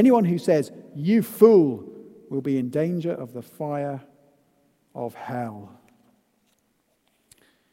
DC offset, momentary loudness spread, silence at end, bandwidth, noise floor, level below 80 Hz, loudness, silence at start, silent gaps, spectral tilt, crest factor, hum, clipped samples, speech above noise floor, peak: under 0.1%; 20 LU; 2.05 s; 16 kHz; -69 dBFS; -74 dBFS; -23 LUFS; 0 s; none; -8 dB/octave; 20 dB; none; under 0.1%; 48 dB; -4 dBFS